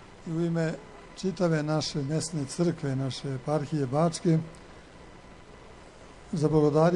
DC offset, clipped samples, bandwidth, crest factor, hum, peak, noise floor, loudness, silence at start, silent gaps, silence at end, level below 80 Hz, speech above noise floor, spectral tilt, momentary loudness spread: under 0.1%; under 0.1%; 11 kHz; 18 dB; none; -10 dBFS; -49 dBFS; -28 LUFS; 0 s; none; 0 s; -54 dBFS; 22 dB; -6.5 dB/octave; 24 LU